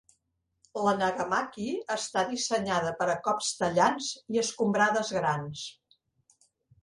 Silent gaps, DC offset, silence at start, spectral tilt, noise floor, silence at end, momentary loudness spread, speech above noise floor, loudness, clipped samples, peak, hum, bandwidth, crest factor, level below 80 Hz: none; under 0.1%; 0.75 s; -3.5 dB/octave; -78 dBFS; 1.1 s; 9 LU; 50 dB; -29 LUFS; under 0.1%; -10 dBFS; none; 11.5 kHz; 20 dB; -66 dBFS